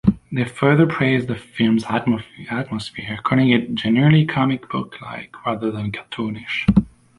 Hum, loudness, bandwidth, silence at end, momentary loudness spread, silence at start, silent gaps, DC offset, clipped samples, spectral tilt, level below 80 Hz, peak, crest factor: none; -20 LUFS; 11.5 kHz; 0.3 s; 12 LU; 0.05 s; none; under 0.1%; under 0.1%; -7.5 dB/octave; -42 dBFS; -2 dBFS; 18 dB